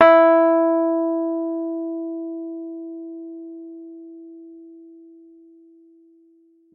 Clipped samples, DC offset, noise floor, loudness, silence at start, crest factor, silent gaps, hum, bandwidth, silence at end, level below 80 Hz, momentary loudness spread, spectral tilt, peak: under 0.1%; under 0.1%; -56 dBFS; -20 LUFS; 0 s; 20 dB; none; none; 5 kHz; 1.95 s; -70 dBFS; 26 LU; -6.5 dB/octave; -2 dBFS